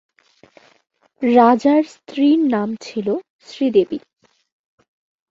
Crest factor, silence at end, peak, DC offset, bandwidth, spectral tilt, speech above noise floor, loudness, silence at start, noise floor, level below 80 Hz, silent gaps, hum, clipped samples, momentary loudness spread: 18 dB; 1.35 s; -2 dBFS; under 0.1%; 7.6 kHz; -6.5 dB/octave; 35 dB; -17 LUFS; 1.2 s; -52 dBFS; -64 dBFS; 3.30-3.39 s; none; under 0.1%; 14 LU